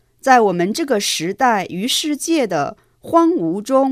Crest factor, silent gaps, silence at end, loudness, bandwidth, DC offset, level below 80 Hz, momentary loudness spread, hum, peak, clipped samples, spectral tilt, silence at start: 16 dB; none; 0 s; -17 LUFS; 16 kHz; under 0.1%; -60 dBFS; 7 LU; none; 0 dBFS; under 0.1%; -3.5 dB/octave; 0.25 s